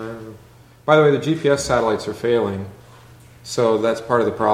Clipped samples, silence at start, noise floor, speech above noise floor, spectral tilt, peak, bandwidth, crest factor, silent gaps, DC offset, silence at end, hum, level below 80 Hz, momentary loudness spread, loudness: under 0.1%; 0 s; -47 dBFS; 29 dB; -5.5 dB/octave; -2 dBFS; 15 kHz; 18 dB; none; under 0.1%; 0 s; none; -50 dBFS; 20 LU; -19 LUFS